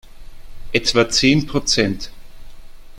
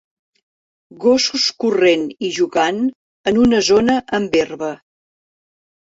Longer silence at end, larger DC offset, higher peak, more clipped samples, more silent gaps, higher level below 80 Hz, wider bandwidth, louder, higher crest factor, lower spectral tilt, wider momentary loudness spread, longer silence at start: second, 0 s vs 1.2 s; neither; about the same, -2 dBFS vs -2 dBFS; neither; second, none vs 2.95-3.24 s; first, -36 dBFS vs -50 dBFS; first, 15.5 kHz vs 8 kHz; about the same, -17 LUFS vs -17 LUFS; about the same, 18 dB vs 16 dB; about the same, -3.5 dB/octave vs -3.5 dB/octave; about the same, 11 LU vs 10 LU; second, 0.05 s vs 1 s